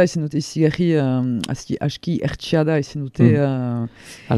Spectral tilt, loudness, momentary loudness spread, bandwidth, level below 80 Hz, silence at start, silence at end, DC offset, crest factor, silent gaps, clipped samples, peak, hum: -7 dB/octave; -20 LUFS; 10 LU; 12.5 kHz; -48 dBFS; 0 s; 0 s; under 0.1%; 18 dB; none; under 0.1%; -2 dBFS; none